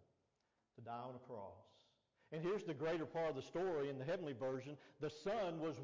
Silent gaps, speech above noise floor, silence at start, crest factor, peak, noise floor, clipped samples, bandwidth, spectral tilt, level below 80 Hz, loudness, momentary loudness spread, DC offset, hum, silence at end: none; 41 dB; 0.75 s; 10 dB; -36 dBFS; -85 dBFS; under 0.1%; 7.6 kHz; -6.5 dB/octave; -78 dBFS; -45 LUFS; 11 LU; under 0.1%; none; 0 s